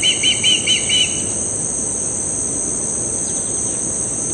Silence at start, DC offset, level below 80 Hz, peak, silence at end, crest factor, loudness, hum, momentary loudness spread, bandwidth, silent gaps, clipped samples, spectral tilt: 0 s; under 0.1%; -44 dBFS; -4 dBFS; 0 s; 16 dB; -16 LUFS; none; 5 LU; 11.5 kHz; none; under 0.1%; -0.5 dB/octave